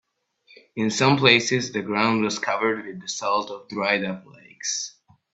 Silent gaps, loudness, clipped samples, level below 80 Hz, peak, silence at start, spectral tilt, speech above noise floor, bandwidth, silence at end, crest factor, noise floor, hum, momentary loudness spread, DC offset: none; -22 LUFS; under 0.1%; -64 dBFS; -2 dBFS; 0.75 s; -3.5 dB/octave; 37 dB; 8.4 kHz; 0.45 s; 22 dB; -60 dBFS; none; 15 LU; under 0.1%